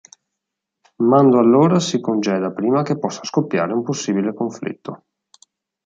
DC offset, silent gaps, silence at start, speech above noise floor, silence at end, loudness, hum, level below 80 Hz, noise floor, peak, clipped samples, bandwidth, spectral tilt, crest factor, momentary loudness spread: under 0.1%; none; 1 s; 64 dB; 0.9 s; -18 LUFS; none; -66 dBFS; -81 dBFS; -2 dBFS; under 0.1%; 8.8 kHz; -6 dB/octave; 16 dB; 13 LU